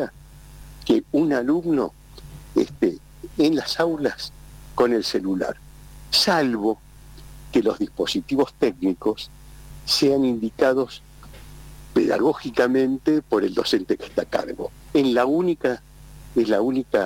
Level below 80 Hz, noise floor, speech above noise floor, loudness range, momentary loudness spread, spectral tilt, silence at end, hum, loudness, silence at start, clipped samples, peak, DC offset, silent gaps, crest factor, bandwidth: -48 dBFS; -44 dBFS; 23 dB; 2 LU; 13 LU; -4.5 dB/octave; 0 s; none; -22 LUFS; 0 s; under 0.1%; -8 dBFS; under 0.1%; none; 14 dB; 17 kHz